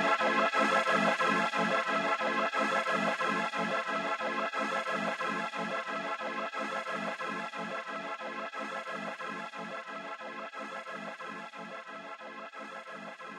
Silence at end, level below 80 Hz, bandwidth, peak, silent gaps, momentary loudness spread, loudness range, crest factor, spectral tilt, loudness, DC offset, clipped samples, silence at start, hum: 0 s; -90 dBFS; 15 kHz; -14 dBFS; none; 16 LU; 12 LU; 20 dB; -4 dB/octave; -32 LUFS; under 0.1%; under 0.1%; 0 s; none